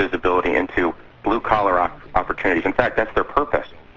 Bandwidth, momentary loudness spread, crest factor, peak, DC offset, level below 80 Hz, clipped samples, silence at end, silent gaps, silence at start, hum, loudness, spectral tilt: 7.6 kHz; 6 LU; 18 dB; -2 dBFS; under 0.1%; -38 dBFS; under 0.1%; 0.05 s; none; 0 s; none; -20 LUFS; -7 dB/octave